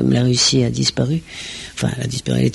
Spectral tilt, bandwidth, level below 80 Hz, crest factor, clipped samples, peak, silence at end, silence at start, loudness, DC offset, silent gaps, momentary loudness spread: -4.5 dB/octave; 11.5 kHz; -42 dBFS; 14 dB; under 0.1%; -4 dBFS; 0 s; 0 s; -18 LUFS; under 0.1%; none; 14 LU